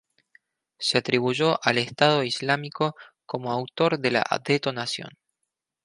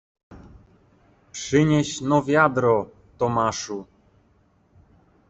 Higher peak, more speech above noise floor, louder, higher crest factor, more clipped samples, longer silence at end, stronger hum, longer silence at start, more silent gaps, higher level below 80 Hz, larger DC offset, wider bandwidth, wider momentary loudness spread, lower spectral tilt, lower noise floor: about the same, -2 dBFS vs -4 dBFS; first, 57 dB vs 40 dB; about the same, -24 LUFS vs -22 LUFS; about the same, 24 dB vs 20 dB; neither; second, 0.75 s vs 1.45 s; neither; first, 0.8 s vs 0.3 s; neither; second, -68 dBFS vs -54 dBFS; neither; first, 11.5 kHz vs 8.2 kHz; second, 9 LU vs 16 LU; about the same, -4.5 dB/octave vs -5.5 dB/octave; first, -82 dBFS vs -61 dBFS